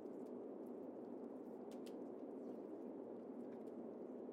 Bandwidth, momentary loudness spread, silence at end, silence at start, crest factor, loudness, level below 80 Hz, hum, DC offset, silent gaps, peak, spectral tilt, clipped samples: 16 kHz; 1 LU; 0 s; 0 s; 12 dB; -53 LUFS; under -90 dBFS; none; under 0.1%; none; -40 dBFS; -7.5 dB/octave; under 0.1%